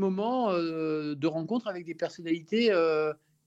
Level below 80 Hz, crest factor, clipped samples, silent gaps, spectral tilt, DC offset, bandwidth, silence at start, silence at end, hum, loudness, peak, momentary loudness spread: -78 dBFS; 14 dB; under 0.1%; none; -6.5 dB/octave; under 0.1%; 8 kHz; 0 s; 0.3 s; none; -29 LUFS; -14 dBFS; 10 LU